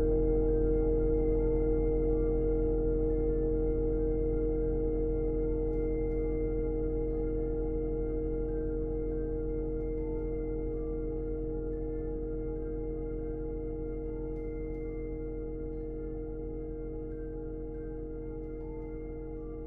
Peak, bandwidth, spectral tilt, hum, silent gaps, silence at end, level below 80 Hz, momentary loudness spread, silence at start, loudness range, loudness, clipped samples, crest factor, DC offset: -18 dBFS; 2.2 kHz; -13.5 dB/octave; none; none; 0 s; -36 dBFS; 11 LU; 0 s; 9 LU; -34 LUFS; under 0.1%; 14 dB; under 0.1%